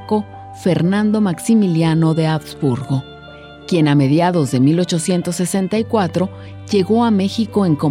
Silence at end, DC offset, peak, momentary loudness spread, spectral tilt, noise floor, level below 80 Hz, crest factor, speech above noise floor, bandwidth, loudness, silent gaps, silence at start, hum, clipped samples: 0 s; under 0.1%; -4 dBFS; 8 LU; -6.5 dB/octave; -37 dBFS; -50 dBFS; 12 dB; 21 dB; 15.5 kHz; -16 LUFS; none; 0 s; none; under 0.1%